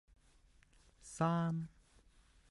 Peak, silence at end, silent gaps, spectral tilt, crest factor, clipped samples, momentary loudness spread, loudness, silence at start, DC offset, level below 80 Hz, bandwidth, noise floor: -22 dBFS; 0.85 s; none; -7 dB/octave; 20 dB; under 0.1%; 19 LU; -38 LUFS; 1.05 s; under 0.1%; -68 dBFS; 11.5 kHz; -68 dBFS